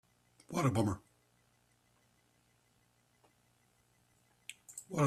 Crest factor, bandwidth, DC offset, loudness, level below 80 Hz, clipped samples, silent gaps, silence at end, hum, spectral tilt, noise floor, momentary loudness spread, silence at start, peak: 24 dB; 15 kHz; under 0.1%; -36 LUFS; -70 dBFS; under 0.1%; none; 0 s; 60 Hz at -75 dBFS; -6.5 dB/octave; -73 dBFS; 20 LU; 0.5 s; -18 dBFS